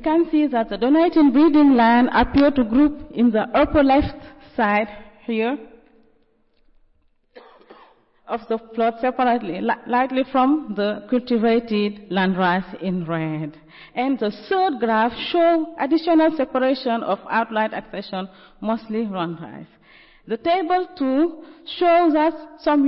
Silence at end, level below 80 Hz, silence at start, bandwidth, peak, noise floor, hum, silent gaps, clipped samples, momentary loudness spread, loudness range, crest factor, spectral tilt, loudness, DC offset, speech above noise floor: 0 s; -44 dBFS; 0 s; 5.8 kHz; -8 dBFS; -61 dBFS; none; none; under 0.1%; 14 LU; 10 LU; 12 dB; -10.5 dB/octave; -20 LUFS; under 0.1%; 41 dB